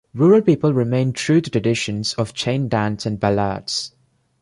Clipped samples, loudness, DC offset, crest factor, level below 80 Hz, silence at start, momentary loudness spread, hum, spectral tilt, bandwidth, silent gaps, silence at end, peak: under 0.1%; -19 LUFS; under 0.1%; 16 dB; -50 dBFS; 0.15 s; 9 LU; none; -6 dB/octave; 11.5 kHz; none; 0.55 s; -4 dBFS